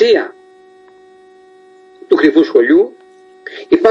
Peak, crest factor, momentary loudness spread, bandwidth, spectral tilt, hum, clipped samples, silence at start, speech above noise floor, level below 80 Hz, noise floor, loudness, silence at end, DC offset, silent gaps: 0 dBFS; 14 dB; 21 LU; 7.4 kHz; -5.5 dB/octave; none; under 0.1%; 0 s; 33 dB; -60 dBFS; -43 dBFS; -12 LUFS; 0 s; under 0.1%; none